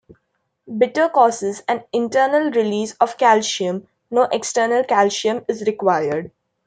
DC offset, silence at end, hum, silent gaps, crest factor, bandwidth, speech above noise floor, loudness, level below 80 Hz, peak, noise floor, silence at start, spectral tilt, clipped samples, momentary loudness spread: under 0.1%; 0.4 s; none; none; 16 dB; 9.4 kHz; 53 dB; -18 LUFS; -66 dBFS; -2 dBFS; -71 dBFS; 0.65 s; -3.5 dB/octave; under 0.1%; 9 LU